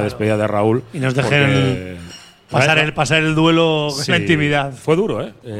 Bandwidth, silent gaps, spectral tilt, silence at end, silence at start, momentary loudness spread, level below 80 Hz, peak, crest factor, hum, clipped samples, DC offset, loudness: 13.5 kHz; none; -5.5 dB/octave; 0 s; 0 s; 8 LU; -46 dBFS; 0 dBFS; 16 dB; none; under 0.1%; under 0.1%; -16 LUFS